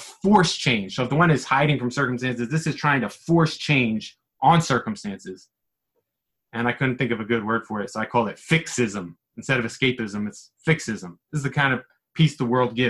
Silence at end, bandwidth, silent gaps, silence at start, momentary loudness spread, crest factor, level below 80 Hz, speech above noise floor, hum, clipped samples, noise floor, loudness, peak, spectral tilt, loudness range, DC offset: 0 s; 12 kHz; none; 0 s; 13 LU; 20 dB; -56 dBFS; 59 dB; none; under 0.1%; -82 dBFS; -23 LUFS; -4 dBFS; -5.5 dB/octave; 5 LU; under 0.1%